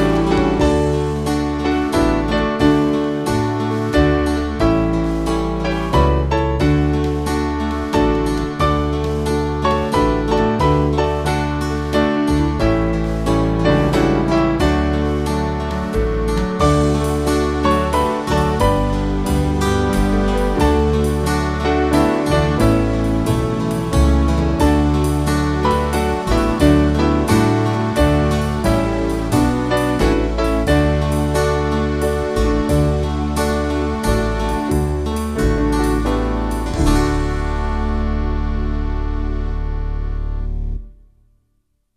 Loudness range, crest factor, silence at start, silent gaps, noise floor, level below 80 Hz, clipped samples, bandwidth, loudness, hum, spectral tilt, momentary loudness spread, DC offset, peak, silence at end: 3 LU; 16 dB; 0 s; none; -65 dBFS; -22 dBFS; under 0.1%; 14 kHz; -18 LUFS; none; -6.5 dB/octave; 6 LU; under 0.1%; 0 dBFS; 1.05 s